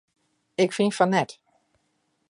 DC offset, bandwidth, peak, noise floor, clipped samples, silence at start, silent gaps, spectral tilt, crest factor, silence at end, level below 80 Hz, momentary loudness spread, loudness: under 0.1%; 11.5 kHz; -6 dBFS; -72 dBFS; under 0.1%; 0.6 s; none; -5.5 dB/octave; 22 dB; 1 s; -74 dBFS; 12 LU; -24 LUFS